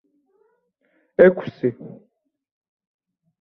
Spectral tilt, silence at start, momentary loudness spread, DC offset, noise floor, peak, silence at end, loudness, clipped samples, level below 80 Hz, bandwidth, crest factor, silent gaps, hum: -10 dB/octave; 1.2 s; 25 LU; under 0.1%; -67 dBFS; 0 dBFS; 1.55 s; -19 LUFS; under 0.1%; -64 dBFS; 5.4 kHz; 22 dB; none; none